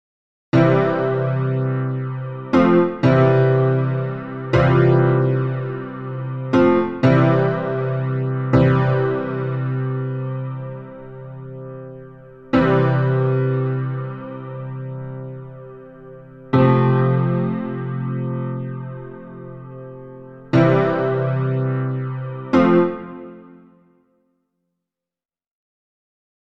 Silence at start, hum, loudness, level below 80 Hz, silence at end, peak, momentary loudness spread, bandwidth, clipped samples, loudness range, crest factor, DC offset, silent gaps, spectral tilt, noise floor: 0.55 s; none; -19 LUFS; -48 dBFS; 3 s; -2 dBFS; 21 LU; 5.8 kHz; under 0.1%; 7 LU; 18 dB; 0.3%; none; -9.5 dB/octave; under -90 dBFS